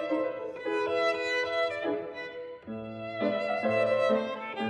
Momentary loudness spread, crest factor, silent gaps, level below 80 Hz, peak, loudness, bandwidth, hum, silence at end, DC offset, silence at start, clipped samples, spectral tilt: 13 LU; 16 dB; none; -72 dBFS; -14 dBFS; -30 LUFS; 10 kHz; none; 0 s; under 0.1%; 0 s; under 0.1%; -5 dB/octave